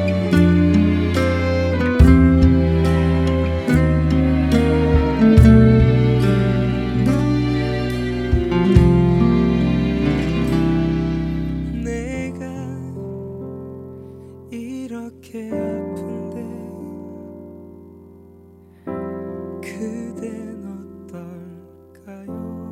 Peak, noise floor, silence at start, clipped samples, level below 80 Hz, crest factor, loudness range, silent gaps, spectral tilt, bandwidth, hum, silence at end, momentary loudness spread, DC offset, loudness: 0 dBFS; -46 dBFS; 0 s; under 0.1%; -26 dBFS; 18 dB; 17 LU; none; -8.5 dB/octave; 12.5 kHz; none; 0 s; 21 LU; under 0.1%; -17 LUFS